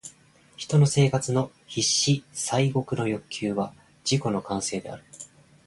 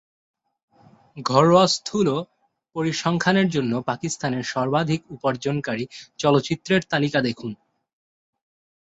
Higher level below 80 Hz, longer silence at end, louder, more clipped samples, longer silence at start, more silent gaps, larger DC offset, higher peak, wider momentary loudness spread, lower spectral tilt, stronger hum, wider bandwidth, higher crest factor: about the same, -60 dBFS vs -60 dBFS; second, 0.4 s vs 1.3 s; second, -25 LUFS vs -22 LUFS; neither; second, 0.05 s vs 1.15 s; neither; neither; second, -10 dBFS vs -2 dBFS; first, 20 LU vs 12 LU; about the same, -4.5 dB/octave vs -5 dB/octave; neither; first, 11.5 kHz vs 8.2 kHz; about the same, 16 dB vs 20 dB